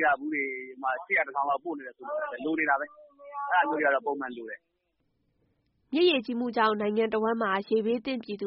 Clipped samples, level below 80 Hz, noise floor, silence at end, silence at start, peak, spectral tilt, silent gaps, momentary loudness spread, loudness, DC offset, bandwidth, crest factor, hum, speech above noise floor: under 0.1%; -74 dBFS; -76 dBFS; 0 s; 0 s; -12 dBFS; -2 dB/octave; none; 13 LU; -28 LUFS; under 0.1%; 5.4 kHz; 18 dB; none; 48 dB